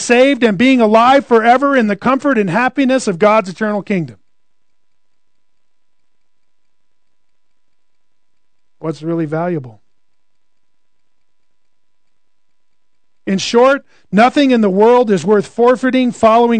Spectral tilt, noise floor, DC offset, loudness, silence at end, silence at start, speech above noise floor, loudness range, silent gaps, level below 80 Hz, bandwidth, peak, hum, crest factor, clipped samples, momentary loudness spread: -5.5 dB/octave; -73 dBFS; 0.4%; -12 LUFS; 0 s; 0 s; 62 dB; 15 LU; none; -60 dBFS; 9.4 kHz; 0 dBFS; none; 14 dB; under 0.1%; 10 LU